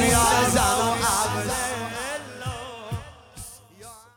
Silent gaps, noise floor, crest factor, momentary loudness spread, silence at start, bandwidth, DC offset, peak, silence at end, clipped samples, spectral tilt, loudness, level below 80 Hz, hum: none; -46 dBFS; 18 dB; 23 LU; 0 s; over 20 kHz; under 0.1%; -6 dBFS; 0.15 s; under 0.1%; -3 dB/octave; -23 LUFS; -40 dBFS; none